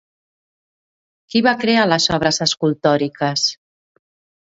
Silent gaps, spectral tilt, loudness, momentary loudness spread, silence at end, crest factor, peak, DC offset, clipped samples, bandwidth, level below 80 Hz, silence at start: none; -4 dB/octave; -17 LUFS; 5 LU; 0.85 s; 20 dB; 0 dBFS; under 0.1%; under 0.1%; 8 kHz; -52 dBFS; 1.35 s